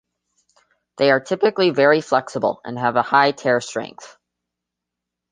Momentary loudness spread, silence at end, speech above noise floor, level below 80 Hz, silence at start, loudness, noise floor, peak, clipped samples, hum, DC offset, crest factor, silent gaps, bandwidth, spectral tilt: 8 LU; 1.25 s; 65 dB; -68 dBFS; 1 s; -18 LUFS; -83 dBFS; -2 dBFS; under 0.1%; none; under 0.1%; 20 dB; none; 9.6 kHz; -5 dB/octave